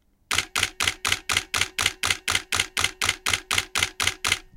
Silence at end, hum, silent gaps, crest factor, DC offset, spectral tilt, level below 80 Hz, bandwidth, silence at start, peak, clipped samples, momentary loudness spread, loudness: 0.15 s; none; none; 24 dB; under 0.1%; 0 dB/octave; -48 dBFS; 17 kHz; 0.3 s; -2 dBFS; under 0.1%; 3 LU; -23 LUFS